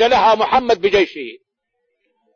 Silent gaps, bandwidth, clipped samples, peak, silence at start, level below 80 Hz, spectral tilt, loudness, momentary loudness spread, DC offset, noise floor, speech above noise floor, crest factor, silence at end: none; 7.4 kHz; under 0.1%; -2 dBFS; 0 s; -48 dBFS; -4 dB/octave; -15 LUFS; 16 LU; under 0.1%; -73 dBFS; 58 dB; 14 dB; 1 s